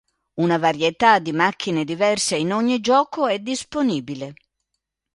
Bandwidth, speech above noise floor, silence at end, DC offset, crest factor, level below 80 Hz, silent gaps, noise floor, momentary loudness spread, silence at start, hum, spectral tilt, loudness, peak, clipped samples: 11.5 kHz; 59 dB; 0.8 s; under 0.1%; 20 dB; -60 dBFS; none; -79 dBFS; 10 LU; 0.35 s; none; -4 dB/octave; -20 LUFS; -2 dBFS; under 0.1%